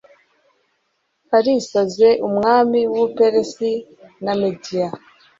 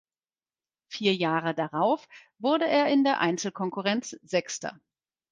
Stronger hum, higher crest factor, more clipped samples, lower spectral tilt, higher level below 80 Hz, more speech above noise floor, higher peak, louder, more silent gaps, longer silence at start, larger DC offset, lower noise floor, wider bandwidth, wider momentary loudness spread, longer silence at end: neither; about the same, 16 dB vs 20 dB; neither; about the same, -5.5 dB/octave vs -4.5 dB/octave; first, -60 dBFS vs -76 dBFS; second, 52 dB vs over 63 dB; first, -2 dBFS vs -8 dBFS; first, -18 LUFS vs -27 LUFS; neither; first, 1.3 s vs 0.9 s; neither; second, -69 dBFS vs under -90 dBFS; second, 7.8 kHz vs 9.8 kHz; about the same, 10 LU vs 9 LU; second, 0.4 s vs 0.6 s